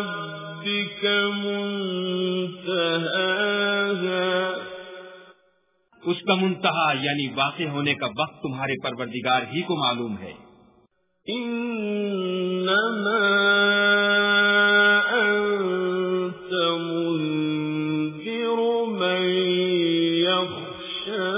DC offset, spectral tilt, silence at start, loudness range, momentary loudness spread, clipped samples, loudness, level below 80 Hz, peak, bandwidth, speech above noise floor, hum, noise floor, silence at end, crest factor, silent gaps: under 0.1%; -8.5 dB/octave; 0 s; 8 LU; 12 LU; under 0.1%; -23 LUFS; -68 dBFS; -6 dBFS; 3.9 kHz; 42 dB; none; -66 dBFS; 0 s; 18 dB; none